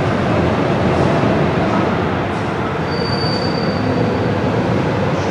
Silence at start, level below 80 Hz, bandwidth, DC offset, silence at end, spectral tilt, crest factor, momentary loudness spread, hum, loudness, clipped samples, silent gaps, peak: 0 s; -36 dBFS; 10.5 kHz; under 0.1%; 0 s; -7 dB/octave; 14 dB; 4 LU; none; -17 LUFS; under 0.1%; none; -2 dBFS